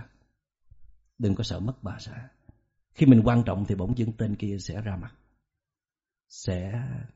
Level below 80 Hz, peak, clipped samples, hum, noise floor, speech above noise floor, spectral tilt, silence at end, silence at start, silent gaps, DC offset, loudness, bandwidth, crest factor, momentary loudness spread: -48 dBFS; -4 dBFS; under 0.1%; none; under -90 dBFS; over 65 dB; -8 dB/octave; 0.1 s; 0 s; none; under 0.1%; -26 LUFS; 8 kHz; 24 dB; 21 LU